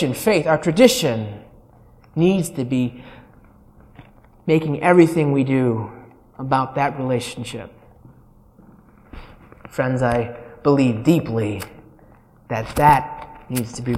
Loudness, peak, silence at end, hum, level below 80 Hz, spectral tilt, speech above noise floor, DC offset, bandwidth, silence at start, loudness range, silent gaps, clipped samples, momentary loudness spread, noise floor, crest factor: -19 LUFS; 0 dBFS; 0 s; none; -46 dBFS; -6 dB/octave; 31 dB; under 0.1%; 16.5 kHz; 0 s; 7 LU; none; under 0.1%; 17 LU; -50 dBFS; 20 dB